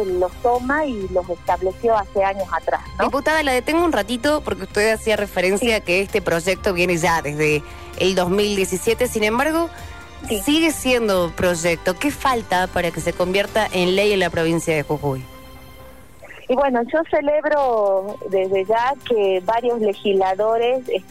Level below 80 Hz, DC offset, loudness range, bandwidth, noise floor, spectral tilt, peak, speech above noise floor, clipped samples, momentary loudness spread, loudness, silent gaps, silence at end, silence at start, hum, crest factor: -42 dBFS; 0.6%; 2 LU; 15.5 kHz; -43 dBFS; -4.5 dB/octave; -8 dBFS; 23 dB; under 0.1%; 6 LU; -19 LUFS; none; 0.1 s; 0 s; none; 12 dB